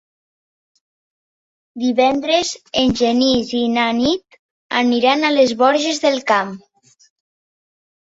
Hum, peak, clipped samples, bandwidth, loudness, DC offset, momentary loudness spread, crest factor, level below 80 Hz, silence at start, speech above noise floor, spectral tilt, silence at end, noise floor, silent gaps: none; 0 dBFS; under 0.1%; 8 kHz; -16 LUFS; under 0.1%; 7 LU; 18 dB; -52 dBFS; 1.75 s; over 74 dB; -3.5 dB/octave; 1.5 s; under -90 dBFS; 4.39-4.70 s